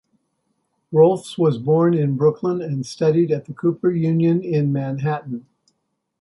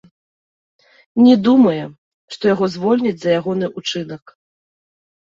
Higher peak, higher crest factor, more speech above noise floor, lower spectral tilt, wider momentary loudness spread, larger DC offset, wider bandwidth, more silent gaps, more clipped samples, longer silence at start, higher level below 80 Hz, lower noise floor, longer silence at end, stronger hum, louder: about the same, -2 dBFS vs -2 dBFS; about the same, 16 dB vs 16 dB; second, 55 dB vs over 75 dB; first, -8.5 dB/octave vs -6.5 dB/octave; second, 8 LU vs 19 LU; neither; first, 11.5 kHz vs 7.6 kHz; second, none vs 1.98-2.28 s; neither; second, 0.9 s vs 1.15 s; about the same, -64 dBFS vs -62 dBFS; second, -73 dBFS vs under -90 dBFS; second, 0.8 s vs 1.15 s; neither; second, -19 LUFS vs -16 LUFS